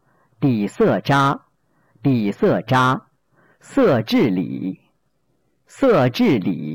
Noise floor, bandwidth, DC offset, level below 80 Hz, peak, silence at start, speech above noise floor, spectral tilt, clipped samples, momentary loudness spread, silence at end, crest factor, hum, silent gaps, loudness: -68 dBFS; 17 kHz; under 0.1%; -54 dBFS; -8 dBFS; 0.4 s; 51 dB; -7 dB/octave; under 0.1%; 10 LU; 0 s; 10 dB; none; none; -19 LUFS